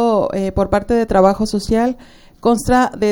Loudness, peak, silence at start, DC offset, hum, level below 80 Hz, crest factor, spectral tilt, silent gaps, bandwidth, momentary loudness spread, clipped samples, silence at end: -16 LUFS; 0 dBFS; 0 s; under 0.1%; none; -34 dBFS; 16 dB; -6 dB/octave; none; 17.5 kHz; 7 LU; under 0.1%; 0 s